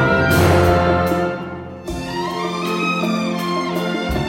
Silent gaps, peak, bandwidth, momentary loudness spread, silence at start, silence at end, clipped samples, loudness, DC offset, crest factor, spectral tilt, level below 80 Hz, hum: none; -2 dBFS; 17 kHz; 14 LU; 0 s; 0 s; under 0.1%; -18 LUFS; under 0.1%; 16 dB; -6 dB/octave; -36 dBFS; none